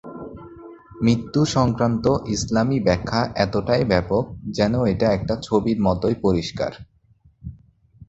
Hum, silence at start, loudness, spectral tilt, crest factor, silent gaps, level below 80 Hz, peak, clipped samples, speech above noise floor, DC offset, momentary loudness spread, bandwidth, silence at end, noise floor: none; 0.05 s; -21 LUFS; -6.5 dB/octave; 20 dB; none; -42 dBFS; -2 dBFS; under 0.1%; 37 dB; under 0.1%; 18 LU; 8.2 kHz; 0.05 s; -57 dBFS